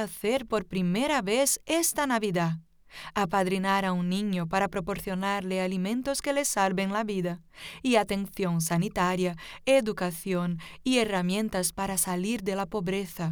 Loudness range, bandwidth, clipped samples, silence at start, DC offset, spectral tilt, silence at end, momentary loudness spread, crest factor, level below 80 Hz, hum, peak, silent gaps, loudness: 2 LU; over 20 kHz; under 0.1%; 0 s; under 0.1%; -4.5 dB/octave; 0 s; 7 LU; 18 dB; -54 dBFS; none; -10 dBFS; none; -28 LUFS